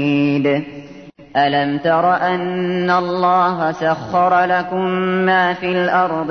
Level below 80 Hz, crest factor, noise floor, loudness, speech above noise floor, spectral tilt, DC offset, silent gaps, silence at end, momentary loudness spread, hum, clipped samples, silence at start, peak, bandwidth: -58 dBFS; 14 dB; -38 dBFS; -16 LUFS; 22 dB; -7 dB/octave; 0.1%; none; 0 s; 5 LU; none; under 0.1%; 0 s; -4 dBFS; 6.6 kHz